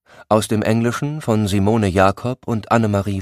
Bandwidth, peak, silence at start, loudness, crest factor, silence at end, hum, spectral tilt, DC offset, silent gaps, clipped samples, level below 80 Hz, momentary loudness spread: 15.5 kHz; 0 dBFS; 0.2 s; -18 LUFS; 18 dB; 0 s; none; -6.5 dB/octave; under 0.1%; none; under 0.1%; -48 dBFS; 7 LU